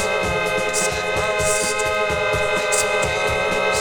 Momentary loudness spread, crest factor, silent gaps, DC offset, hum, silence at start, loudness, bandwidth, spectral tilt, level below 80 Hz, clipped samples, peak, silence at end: 2 LU; 14 dB; none; under 0.1%; none; 0 s; -19 LUFS; 19.5 kHz; -2 dB/octave; -40 dBFS; under 0.1%; -6 dBFS; 0 s